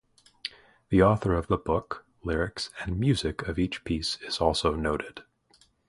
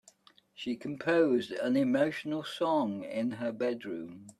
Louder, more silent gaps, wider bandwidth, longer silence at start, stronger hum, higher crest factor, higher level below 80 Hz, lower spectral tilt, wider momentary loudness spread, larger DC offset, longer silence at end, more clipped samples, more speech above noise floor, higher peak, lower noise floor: first, -28 LUFS vs -31 LUFS; neither; second, 11.5 kHz vs 13 kHz; second, 0.45 s vs 0.6 s; neither; about the same, 22 dB vs 18 dB; first, -42 dBFS vs -76 dBFS; about the same, -6 dB/octave vs -6 dB/octave; first, 16 LU vs 11 LU; neither; first, 0.65 s vs 0.1 s; neither; first, 37 dB vs 31 dB; first, -8 dBFS vs -14 dBFS; about the same, -64 dBFS vs -62 dBFS